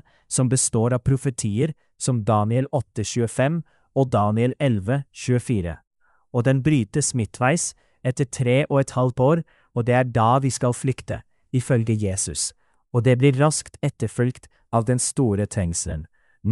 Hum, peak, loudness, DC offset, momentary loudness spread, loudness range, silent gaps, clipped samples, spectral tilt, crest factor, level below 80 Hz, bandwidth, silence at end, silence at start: none; -6 dBFS; -22 LUFS; under 0.1%; 9 LU; 2 LU; 5.87-5.91 s; under 0.1%; -5.5 dB/octave; 16 dB; -46 dBFS; 12 kHz; 0 s; 0.3 s